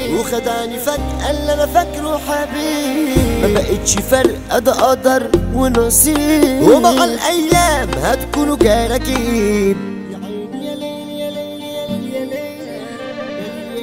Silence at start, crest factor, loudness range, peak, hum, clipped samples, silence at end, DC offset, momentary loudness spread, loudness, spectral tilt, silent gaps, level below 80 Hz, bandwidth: 0 s; 16 dB; 12 LU; 0 dBFS; none; under 0.1%; 0 s; 0.3%; 15 LU; -15 LUFS; -4 dB/octave; none; -28 dBFS; 16.5 kHz